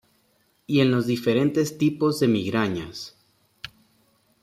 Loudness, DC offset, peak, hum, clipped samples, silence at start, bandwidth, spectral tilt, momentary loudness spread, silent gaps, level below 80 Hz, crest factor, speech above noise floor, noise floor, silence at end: -23 LUFS; under 0.1%; -8 dBFS; none; under 0.1%; 0.7 s; 15.5 kHz; -6 dB/octave; 20 LU; none; -62 dBFS; 18 dB; 43 dB; -65 dBFS; 0.75 s